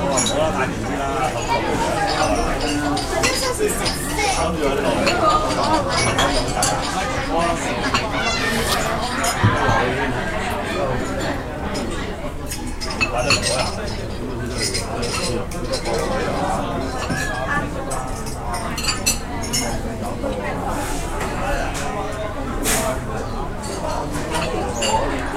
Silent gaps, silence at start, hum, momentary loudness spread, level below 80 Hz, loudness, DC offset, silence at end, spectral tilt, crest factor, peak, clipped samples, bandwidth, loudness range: none; 0 s; none; 9 LU; -30 dBFS; -21 LUFS; under 0.1%; 0 s; -3.5 dB/octave; 18 dB; -2 dBFS; under 0.1%; 16 kHz; 5 LU